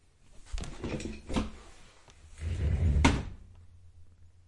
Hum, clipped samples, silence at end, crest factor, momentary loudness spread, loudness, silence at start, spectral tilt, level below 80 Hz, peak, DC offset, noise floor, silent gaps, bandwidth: none; under 0.1%; 0.2 s; 26 dB; 19 LU; -32 LUFS; 0.4 s; -5.5 dB/octave; -38 dBFS; -8 dBFS; under 0.1%; -55 dBFS; none; 11.5 kHz